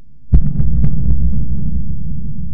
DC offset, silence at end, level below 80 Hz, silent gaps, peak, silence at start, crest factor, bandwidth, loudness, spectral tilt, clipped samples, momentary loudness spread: 30%; 0 s; -18 dBFS; none; 0 dBFS; 0 s; 16 dB; 1.7 kHz; -19 LUFS; -13.5 dB/octave; under 0.1%; 9 LU